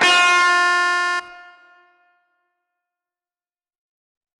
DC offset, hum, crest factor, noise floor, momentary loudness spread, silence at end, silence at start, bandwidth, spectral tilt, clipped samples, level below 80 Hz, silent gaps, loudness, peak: under 0.1%; none; 18 dB; under -90 dBFS; 10 LU; 3 s; 0 s; 12 kHz; 0.5 dB/octave; under 0.1%; -74 dBFS; none; -15 LUFS; -4 dBFS